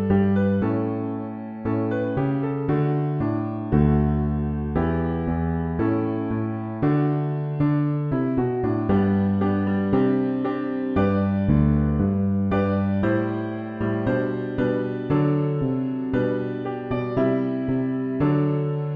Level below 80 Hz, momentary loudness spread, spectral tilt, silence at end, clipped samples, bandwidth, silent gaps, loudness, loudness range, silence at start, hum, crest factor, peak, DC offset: -38 dBFS; 6 LU; -11.5 dB/octave; 0 s; under 0.1%; 4.9 kHz; none; -23 LUFS; 2 LU; 0 s; none; 16 dB; -6 dBFS; under 0.1%